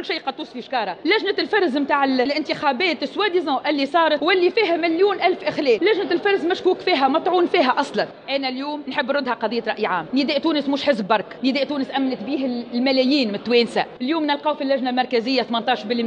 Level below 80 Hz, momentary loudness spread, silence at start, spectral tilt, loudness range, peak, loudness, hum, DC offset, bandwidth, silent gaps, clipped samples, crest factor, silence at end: -68 dBFS; 7 LU; 0 s; -5 dB/octave; 3 LU; -4 dBFS; -20 LUFS; none; under 0.1%; 9.6 kHz; none; under 0.1%; 16 dB; 0 s